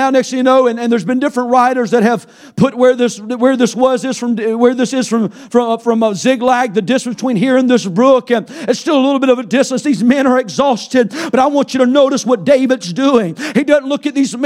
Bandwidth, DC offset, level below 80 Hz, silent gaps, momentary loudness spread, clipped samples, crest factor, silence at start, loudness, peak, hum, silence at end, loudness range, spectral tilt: 12.5 kHz; under 0.1%; -60 dBFS; none; 6 LU; under 0.1%; 12 dB; 0 s; -13 LUFS; 0 dBFS; none; 0 s; 1 LU; -5 dB/octave